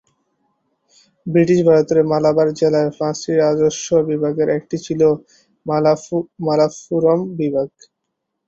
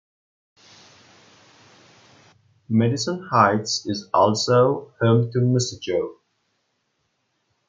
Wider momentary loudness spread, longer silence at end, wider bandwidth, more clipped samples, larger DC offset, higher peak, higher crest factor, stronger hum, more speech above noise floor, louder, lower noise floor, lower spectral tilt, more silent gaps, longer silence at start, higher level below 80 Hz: about the same, 9 LU vs 8 LU; second, 0.8 s vs 1.55 s; second, 8 kHz vs 9 kHz; neither; neither; about the same, -2 dBFS vs -2 dBFS; second, 16 dB vs 22 dB; neither; first, 60 dB vs 52 dB; first, -17 LUFS vs -21 LUFS; first, -76 dBFS vs -72 dBFS; about the same, -6.5 dB/octave vs -5.5 dB/octave; neither; second, 1.25 s vs 2.7 s; first, -56 dBFS vs -66 dBFS